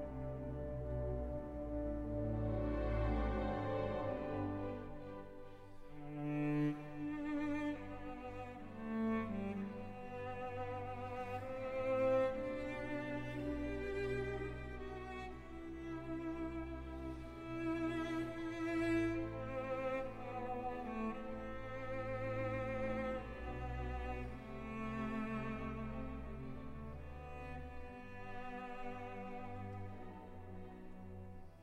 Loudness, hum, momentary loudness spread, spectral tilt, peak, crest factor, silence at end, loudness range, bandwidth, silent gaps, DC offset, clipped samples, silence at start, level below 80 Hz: -43 LUFS; none; 12 LU; -8 dB/octave; -26 dBFS; 16 dB; 0 s; 9 LU; 12 kHz; none; under 0.1%; under 0.1%; 0 s; -52 dBFS